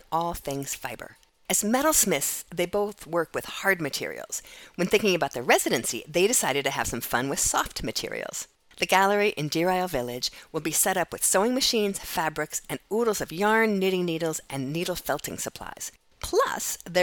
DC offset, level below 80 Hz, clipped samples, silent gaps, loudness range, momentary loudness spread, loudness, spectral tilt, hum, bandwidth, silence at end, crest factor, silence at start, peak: under 0.1%; -52 dBFS; under 0.1%; none; 3 LU; 12 LU; -26 LUFS; -2.5 dB/octave; none; 19 kHz; 0 s; 22 dB; 0.1 s; -4 dBFS